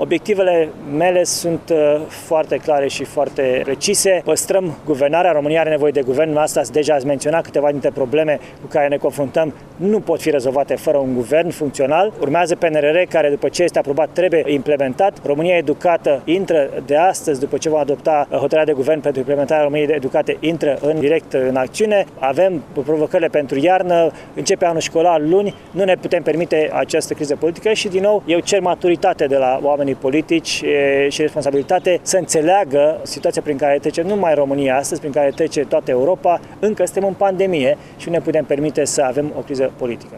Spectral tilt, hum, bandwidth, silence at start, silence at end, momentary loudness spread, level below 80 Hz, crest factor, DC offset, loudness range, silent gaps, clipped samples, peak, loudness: -4.5 dB/octave; none; 15 kHz; 0 s; 0 s; 5 LU; -52 dBFS; 14 dB; under 0.1%; 2 LU; none; under 0.1%; -2 dBFS; -17 LUFS